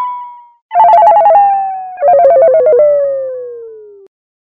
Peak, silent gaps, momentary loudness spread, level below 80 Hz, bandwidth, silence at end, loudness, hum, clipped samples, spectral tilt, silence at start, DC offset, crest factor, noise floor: 0 dBFS; 0.62-0.69 s; 18 LU; -56 dBFS; 5 kHz; 0.7 s; -8 LUFS; none; under 0.1%; -6 dB/octave; 0 s; under 0.1%; 10 dB; -31 dBFS